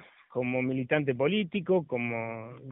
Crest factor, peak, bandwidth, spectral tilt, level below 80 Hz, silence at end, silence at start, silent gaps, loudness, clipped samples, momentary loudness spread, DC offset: 18 dB; -12 dBFS; 3.9 kHz; -4 dB/octave; -70 dBFS; 0 s; 0 s; none; -30 LUFS; under 0.1%; 10 LU; under 0.1%